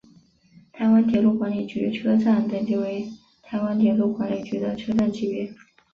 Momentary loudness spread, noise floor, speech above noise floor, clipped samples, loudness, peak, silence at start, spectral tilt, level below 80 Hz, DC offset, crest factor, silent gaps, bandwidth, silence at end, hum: 10 LU; -55 dBFS; 33 dB; under 0.1%; -23 LUFS; -8 dBFS; 0.75 s; -8 dB/octave; -60 dBFS; under 0.1%; 14 dB; none; 6.8 kHz; 0.4 s; none